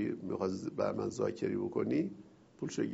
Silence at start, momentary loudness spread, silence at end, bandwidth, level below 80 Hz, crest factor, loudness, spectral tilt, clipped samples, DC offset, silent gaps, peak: 0 s; 7 LU; 0 s; 8 kHz; -70 dBFS; 16 dB; -36 LUFS; -7 dB/octave; under 0.1%; under 0.1%; none; -20 dBFS